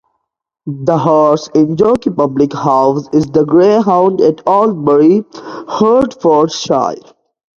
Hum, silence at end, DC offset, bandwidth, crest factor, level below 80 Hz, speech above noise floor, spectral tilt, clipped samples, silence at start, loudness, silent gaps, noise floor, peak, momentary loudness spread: none; 0.6 s; under 0.1%; 7.6 kHz; 12 dB; -48 dBFS; 58 dB; -7 dB/octave; under 0.1%; 0.65 s; -11 LUFS; none; -69 dBFS; 0 dBFS; 10 LU